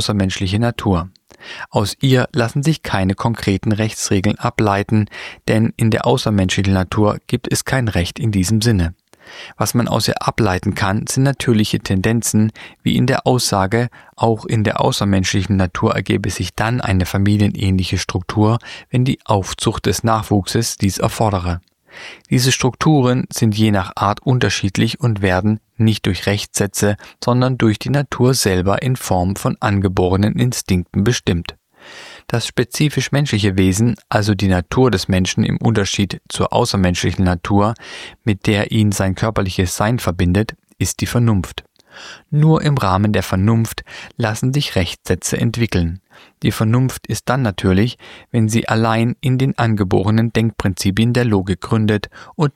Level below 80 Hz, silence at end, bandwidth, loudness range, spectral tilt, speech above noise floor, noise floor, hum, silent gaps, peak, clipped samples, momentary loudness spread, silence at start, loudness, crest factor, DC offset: -40 dBFS; 0.05 s; 16 kHz; 2 LU; -5.5 dB/octave; 23 dB; -39 dBFS; none; none; -2 dBFS; under 0.1%; 6 LU; 0 s; -17 LUFS; 16 dB; under 0.1%